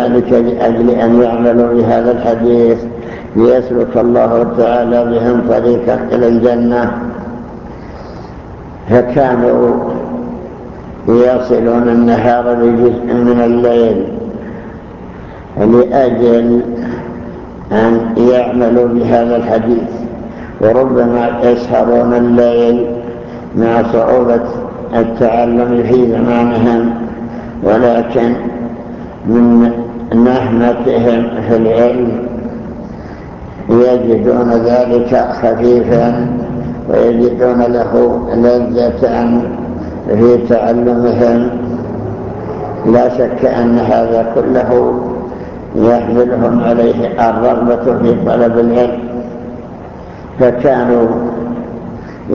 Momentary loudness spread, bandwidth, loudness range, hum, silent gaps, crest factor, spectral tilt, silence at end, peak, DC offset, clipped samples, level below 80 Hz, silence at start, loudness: 16 LU; 6.4 kHz; 3 LU; none; none; 12 dB; -9 dB/octave; 0 s; 0 dBFS; under 0.1%; under 0.1%; -36 dBFS; 0 s; -11 LUFS